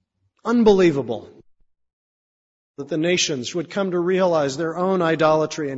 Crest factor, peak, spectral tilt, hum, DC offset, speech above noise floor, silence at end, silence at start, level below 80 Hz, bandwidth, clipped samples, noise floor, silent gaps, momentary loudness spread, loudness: 18 dB; -4 dBFS; -5 dB/octave; none; under 0.1%; 39 dB; 0 s; 0.45 s; -54 dBFS; 8 kHz; under 0.1%; -59 dBFS; 1.93-2.74 s; 13 LU; -20 LUFS